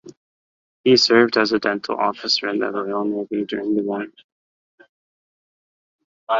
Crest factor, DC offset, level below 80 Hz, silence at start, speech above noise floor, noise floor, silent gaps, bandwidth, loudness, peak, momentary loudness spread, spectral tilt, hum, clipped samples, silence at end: 20 dB; under 0.1%; -64 dBFS; 0.05 s; over 70 dB; under -90 dBFS; 0.17-0.84 s, 4.24-4.78 s, 4.89-6.27 s; 7.8 kHz; -19 LUFS; -2 dBFS; 11 LU; -4 dB/octave; none; under 0.1%; 0 s